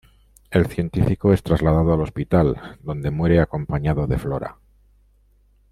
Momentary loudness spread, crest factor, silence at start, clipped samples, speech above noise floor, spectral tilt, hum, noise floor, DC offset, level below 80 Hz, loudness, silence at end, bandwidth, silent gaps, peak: 10 LU; 18 dB; 0.5 s; under 0.1%; 38 dB; -9 dB/octave; 50 Hz at -45 dBFS; -57 dBFS; under 0.1%; -36 dBFS; -21 LUFS; 1.2 s; 13.5 kHz; none; -4 dBFS